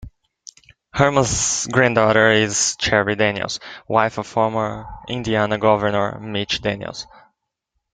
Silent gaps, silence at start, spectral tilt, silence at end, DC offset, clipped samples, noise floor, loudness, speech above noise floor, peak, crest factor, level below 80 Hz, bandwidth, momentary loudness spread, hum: none; 0 s; -3.5 dB/octave; 0.9 s; under 0.1%; under 0.1%; -76 dBFS; -19 LUFS; 57 dB; 0 dBFS; 20 dB; -46 dBFS; 10 kHz; 14 LU; none